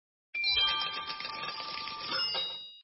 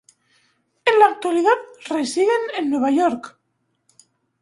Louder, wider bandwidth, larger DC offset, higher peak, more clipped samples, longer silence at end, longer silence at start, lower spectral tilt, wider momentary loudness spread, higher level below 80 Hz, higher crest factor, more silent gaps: second, -31 LUFS vs -19 LUFS; second, 6 kHz vs 11.5 kHz; neither; second, -18 dBFS vs -2 dBFS; neither; second, 0 s vs 1.15 s; second, 0.35 s vs 0.85 s; about the same, -3.5 dB/octave vs -3 dB/octave; about the same, 11 LU vs 10 LU; first, -64 dBFS vs -70 dBFS; about the same, 18 dB vs 20 dB; neither